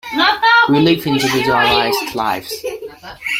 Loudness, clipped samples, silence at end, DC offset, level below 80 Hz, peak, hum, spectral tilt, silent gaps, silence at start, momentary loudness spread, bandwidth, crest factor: -14 LUFS; under 0.1%; 0 s; under 0.1%; -48 dBFS; -2 dBFS; none; -4 dB/octave; none; 0.05 s; 16 LU; 16.5 kHz; 14 dB